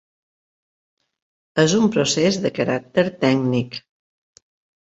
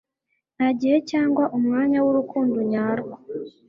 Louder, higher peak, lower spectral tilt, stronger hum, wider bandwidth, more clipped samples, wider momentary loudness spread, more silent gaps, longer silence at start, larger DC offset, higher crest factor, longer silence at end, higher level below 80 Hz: first, -19 LUFS vs -22 LUFS; first, -2 dBFS vs -8 dBFS; second, -5 dB/octave vs -7 dB/octave; neither; first, 8.2 kHz vs 7.2 kHz; neither; about the same, 9 LU vs 10 LU; neither; first, 1.55 s vs 0.6 s; neither; first, 20 dB vs 14 dB; first, 1.1 s vs 0.2 s; first, -58 dBFS vs -64 dBFS